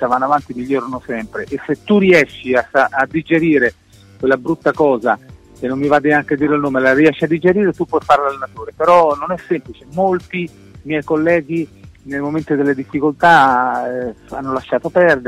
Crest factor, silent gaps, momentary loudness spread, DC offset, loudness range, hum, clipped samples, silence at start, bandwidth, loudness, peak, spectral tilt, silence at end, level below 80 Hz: 14 dB; none; 13 LU; under 0.1%; 4 LU; none; under 0.1%; 0 s; 13 kHz; -15 LUFS; 0 dBFS; -7 dB/octave; 0 s; -48 dBFS